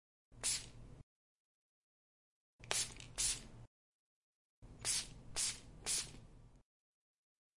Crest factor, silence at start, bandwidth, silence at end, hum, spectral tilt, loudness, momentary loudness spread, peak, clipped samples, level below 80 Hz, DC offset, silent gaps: 28 dB; 0.3 s; 11.5 kHz; 1 s; none; 0 dB/octave; -40 LUFS; 16 LU; -18 dBFS; under 0.1%; -62 dBFS; under 0.1%; 1.03-2.59 s, 3.67-4.62 s